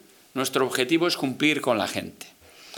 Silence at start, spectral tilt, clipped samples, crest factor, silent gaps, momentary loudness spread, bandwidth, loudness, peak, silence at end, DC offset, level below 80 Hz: 0.35 s; -3.5 dB/octave; under 0.1%; 20 dB; none; 17 LU; 19.5 kHz; -24 LUFS; -6 dBFS; 0 s; under 0.1%; -74 dBFS